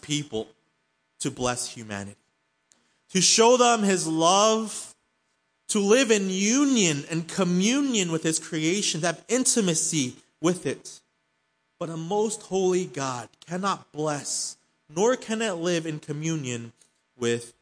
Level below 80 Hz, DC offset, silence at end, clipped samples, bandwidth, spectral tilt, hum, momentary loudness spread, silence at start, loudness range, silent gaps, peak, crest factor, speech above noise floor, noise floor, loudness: -66 dBFS; under 0.1%; 0.1 s; under 0.1%; 10.5 kHz; -3.5 dB/octave; none; 15 LU; 0 s; 7 LU; none; -6 dBFS; 20 dB; 49 dB; -73 dBFS; -24 LUFS